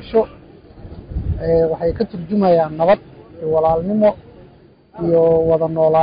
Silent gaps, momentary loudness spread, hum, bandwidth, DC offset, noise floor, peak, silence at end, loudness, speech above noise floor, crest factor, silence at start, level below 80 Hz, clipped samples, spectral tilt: none; 13 LU; none; 5.2 kHz; under 0.1%; -47 dBFS; -4 dBFS; 0 s; -17 LUFS; 31 dB; 12 dB; 0 s; -36 dBFS; under 0.1%; -13 dB/octave